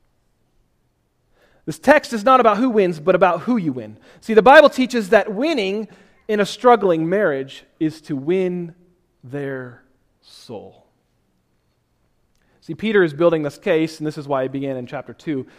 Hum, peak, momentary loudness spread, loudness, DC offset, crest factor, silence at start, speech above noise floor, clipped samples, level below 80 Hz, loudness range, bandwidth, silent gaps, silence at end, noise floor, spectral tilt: none; 0 dBFS; 21 LU; -17 LUFS; under 0.1%; 20 dB; 1.65 s; 48 dB; under 0.1%; -56 dBFS; 13 LU; 15 kHz; none; 0.15 s; -65 dBFS; -6 dB/octave